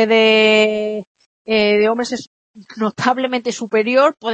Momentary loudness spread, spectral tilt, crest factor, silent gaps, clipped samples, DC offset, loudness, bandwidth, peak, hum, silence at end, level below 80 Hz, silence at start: 13 LU; -4 dB/octave; 14 dB; 1.07-1.15 s, 1.26-1.45 s, 2.27-2.54 s; under 0.1%; under 0.1%; -16 LUFS; 8.6 kHz; -2 dBFS; none; 0 s; -60 dBFS; 0 s